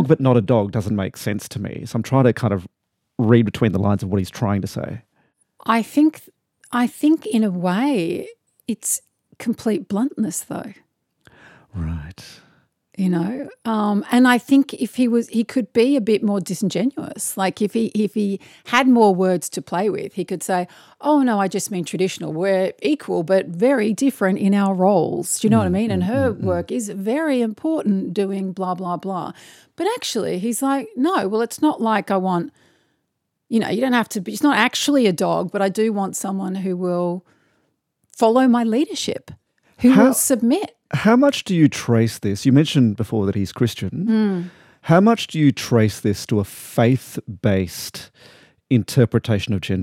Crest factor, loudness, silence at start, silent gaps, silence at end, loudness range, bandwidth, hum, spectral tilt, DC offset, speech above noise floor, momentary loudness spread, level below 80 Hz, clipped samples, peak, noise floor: 18 dB; -19 LUFS; 0 s; none; 0 s; 5 LU; 16.5 kHz; none; -5.5 dB/octave; under 0.1%; 56 dB; 11 LU; -56 dBFS; under 0.1%; -2 dBFS; -75 dBFS